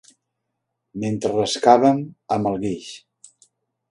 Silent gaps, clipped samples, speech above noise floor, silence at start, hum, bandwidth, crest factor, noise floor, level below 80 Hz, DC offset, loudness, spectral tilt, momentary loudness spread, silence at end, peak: none; under 0.1%; 59 dB; 0.95 s; none; 11.5 kHz; 22 dB; -78 dBFS; -58 dBFS; under 0.1%; -20 LUFS; -5.5 dB/octave; 21 LU; 0.95 s; 0 dBFS